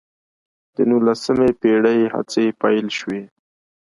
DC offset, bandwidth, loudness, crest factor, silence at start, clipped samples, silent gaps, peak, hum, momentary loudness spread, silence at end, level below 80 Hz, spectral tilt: under 0.1%; 11.5 kHz; -18 LUFS; 16 dB; 0.8 s; under 0.1%; none; -2 dBFS; none; 10 LU; 0.6 s; -56 dBFS; -5.5 dB/octave